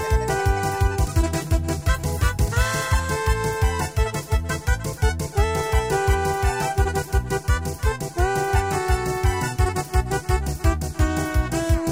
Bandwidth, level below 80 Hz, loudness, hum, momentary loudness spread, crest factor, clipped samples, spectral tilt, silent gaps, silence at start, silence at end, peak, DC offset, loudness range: 16 kHz; -26 dBFS; -23 LUFS; none; 3 LU; 14 dB; under 0.1%; -5 dB/octave; none; 0 s; 0 s; -8 dBFS; 0.2%; 1 LU